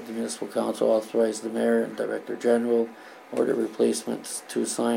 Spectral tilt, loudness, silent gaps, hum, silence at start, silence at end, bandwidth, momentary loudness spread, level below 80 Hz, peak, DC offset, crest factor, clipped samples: -4 dB/octave; -26 LUFS; none; none; 0 s; 0 s; 16.5 kHz; 8 LU; -78 dBFS; -10 dBFS; under 0.1%; 16 dB; under 0.1%